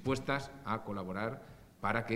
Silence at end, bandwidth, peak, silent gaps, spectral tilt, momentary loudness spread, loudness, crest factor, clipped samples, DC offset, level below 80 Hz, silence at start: 0 s; 16 kHz; -14 dBFS; none; -6 dB/octave; 9 LU; -38 LUFS; 22 dB; under 0.1%; under 0.1%; -58 dBFS; 0 s